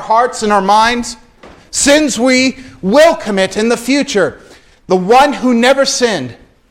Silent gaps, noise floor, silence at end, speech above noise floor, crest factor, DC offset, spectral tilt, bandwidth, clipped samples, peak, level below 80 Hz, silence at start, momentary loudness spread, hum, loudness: none; -40 dBFS; 0.35 s; 29 dB; 12 dB; under 0.1%; -3.5 dB/octave; 16.5 kHz; under 0.1%; 0 dBFS; -42 dBFS; 0 s; 10 LU; none; -11 LUFS